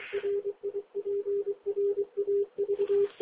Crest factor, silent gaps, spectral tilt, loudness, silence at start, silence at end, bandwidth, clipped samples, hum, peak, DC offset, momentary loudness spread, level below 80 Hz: 10 dB; none; -4 dB/octave; -31 LUFS; 0 s; 0.1 s; 4 kHz; under 0.1%; none; -20 dBFS; under 0.1%; 8 LU; -74 dBFS